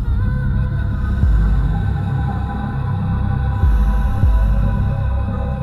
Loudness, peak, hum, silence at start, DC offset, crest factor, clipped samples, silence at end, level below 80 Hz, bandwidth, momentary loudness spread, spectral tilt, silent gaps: -19 LUFS; -2 dBFS; none; 0 s; under 0.1%; 14 dB; under 0.1%; 0 s; -18 dBFS; 4.3 kHz; 5 LU; -9.5 dB/octave; none